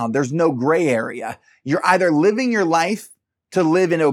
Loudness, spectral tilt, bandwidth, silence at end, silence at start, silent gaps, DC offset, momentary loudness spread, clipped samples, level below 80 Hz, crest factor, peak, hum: -18 LUFS; -6 dB/octave; 14 kHz; 0 s; 0 s; none; under 0.1%; 12 LU; under 0.1%; -72 dBFS; 18 dB; -2 dBFS; none